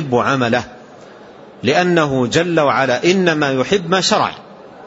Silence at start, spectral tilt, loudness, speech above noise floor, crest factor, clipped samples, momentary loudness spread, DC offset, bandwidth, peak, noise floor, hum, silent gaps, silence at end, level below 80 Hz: 0 s; -4.5 dB/octave; -15 LUFS; 24 dB; 16 dB; under 0.1%; 7 LU; under 0.1%; 8 kHz; -2 dBFS; -39 dBFS; none; none; 0 s; -52 dBFS